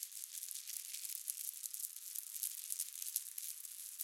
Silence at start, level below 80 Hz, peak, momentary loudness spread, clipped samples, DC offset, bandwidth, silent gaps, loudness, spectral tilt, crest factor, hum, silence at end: 0 s; under -90 dBFS; -12 dBFS; 4 LU; under 0.1%; under 0.1%; 17 kHz; none; -43 LUFS; 9.5 dB/octave; 34 dB; none; 0 s